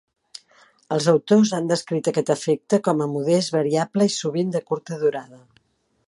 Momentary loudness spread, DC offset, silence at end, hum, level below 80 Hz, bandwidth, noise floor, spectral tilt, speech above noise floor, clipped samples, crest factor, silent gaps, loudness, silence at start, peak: 8 LU; under 0.1%; 0.7 s; none; -70 dBFS; 11.5 kHz; -56 dBFS; -5.5 dB/octave; 35 dB; under 0.1%; 18 dB; none; -21 LUFS; 0.9 s; -4 dBFS